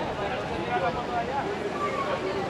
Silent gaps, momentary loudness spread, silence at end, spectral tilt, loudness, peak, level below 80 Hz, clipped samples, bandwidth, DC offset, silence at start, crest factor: none; 3 LU; 0 s; -5.5 dB/octave; -29 LUFS; -14 dBFS; -50 dBFS; under 0.1%; 13.5 kHz; under 0.1%; 0 s; 14 dB